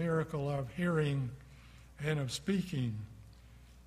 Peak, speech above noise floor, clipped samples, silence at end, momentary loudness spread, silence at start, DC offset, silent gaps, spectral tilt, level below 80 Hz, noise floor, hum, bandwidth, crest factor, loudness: -18 dBFS; 22 dB; under 0.1%; 0 s; 23 LU; 0 s; under 0.1%; none; -6.5 dB/octave; -58 dBFS; -56 dBFS; none; 14.5 kHz; 18 dB; -36 LUFS